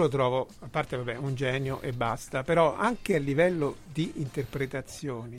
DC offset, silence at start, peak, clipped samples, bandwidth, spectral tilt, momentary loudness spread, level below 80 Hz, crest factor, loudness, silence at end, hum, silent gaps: under 0.1%; 0 s; -10 dBFS; under 0.1%; 16 kHz; -6 dB/octave; 9 LU; -52 dBFS; 18 dB; -29 LUFS; 0 s; none; none